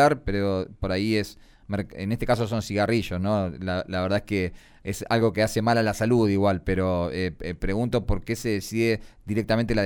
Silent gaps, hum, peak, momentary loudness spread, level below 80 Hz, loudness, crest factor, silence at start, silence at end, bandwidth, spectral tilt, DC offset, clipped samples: none; none; -8 dBFS; 9 LU; -40 dBFS; -26 LUFS; 16 dB; 0 s; 0 s; 19.5 kHz; -6 dB/octave; under 0.1%; under 0.1%